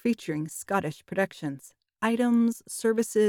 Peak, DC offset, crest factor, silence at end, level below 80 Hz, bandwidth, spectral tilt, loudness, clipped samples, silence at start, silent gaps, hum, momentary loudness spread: -12 dBFS; under 0.1%; 16 dB; 0 s; -70 dBFS; 17 kHz; -5.5 dB/octave; -28 LUFS; under 0.1%; 0.05 s; none; none; 10 LU